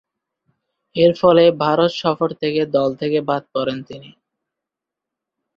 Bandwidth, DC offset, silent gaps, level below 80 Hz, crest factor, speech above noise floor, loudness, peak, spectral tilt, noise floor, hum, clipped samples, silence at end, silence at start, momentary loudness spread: 7 kHz; under 0.1%; none; -60 dBFS; 18 dB; 68 dB; -17 LUFS; -2 dBFS; -7 dB/octave; -85 dBFS; none; under 0.1%; 1.5 s; 0.95 s; 15 LU